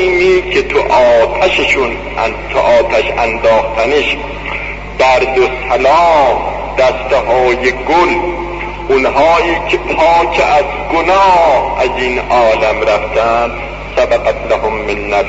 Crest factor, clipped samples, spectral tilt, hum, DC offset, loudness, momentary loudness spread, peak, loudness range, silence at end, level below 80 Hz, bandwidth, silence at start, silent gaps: 10 dB; under 0.1%; -4.5 dB/octave; 50 Hz at -30 dBFS; under 0.1%; -11 LUFS; 8 LU; 0 dBFS; 2 LU; 0 s; -28 dBFS; 8 kHz; 0 s; none